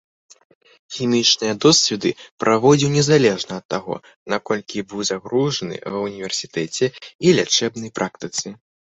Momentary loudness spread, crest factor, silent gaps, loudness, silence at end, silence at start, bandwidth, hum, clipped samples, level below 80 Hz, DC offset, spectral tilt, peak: 12 LU; 18 dB; 2.31-2.38 s, 3.65-3.69 s, 4.16-4.26 s, 7.15-7.19 s; -19 LUFS; 0.35 s; 0.9 s; 8.2 kHz; none; under 0.1%; -58 dBFS; under 0.1%; -4 dB/octave; -2 dBFS